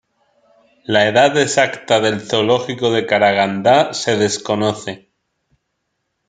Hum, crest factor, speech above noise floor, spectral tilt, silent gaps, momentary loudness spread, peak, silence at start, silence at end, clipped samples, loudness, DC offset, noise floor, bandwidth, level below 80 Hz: none; 16 dB; 57 dB; -4 dB/octave; none; 7 LU; 0 dBFS; 0.9 s; 1.3 s; under 0.1%; -15 LUFS; under 0.1%; -72 dBFS; 9.6 kHz; -62 dBFS